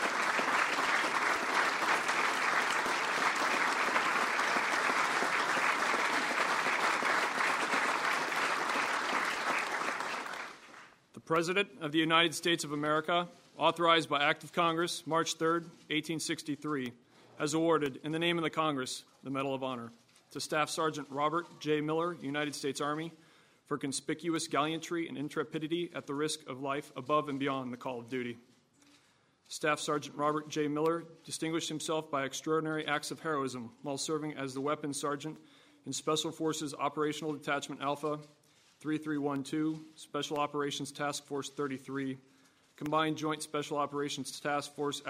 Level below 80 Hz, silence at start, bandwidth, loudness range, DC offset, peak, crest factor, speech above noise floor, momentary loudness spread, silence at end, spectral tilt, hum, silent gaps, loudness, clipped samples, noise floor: -80 dBFS; 0 s; 16 kHz; 7 LU; under 0.1%; -12 dBFS; 22 dB; 34 dB; 10 LU; 0 s; -3.5 dB/octave; none; none; -33 LUFS; under 0.1%; -68 dBFS